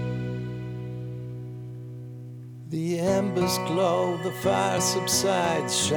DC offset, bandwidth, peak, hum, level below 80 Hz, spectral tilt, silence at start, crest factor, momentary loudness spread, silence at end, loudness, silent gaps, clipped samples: under 0.1%; over 20 kHz; -10 dBFS; none; -58 dBFS; -4 dB/octave; 0 s; 16 dB; 17 LU; 0 s; -26 LUFS; none; under 0.1%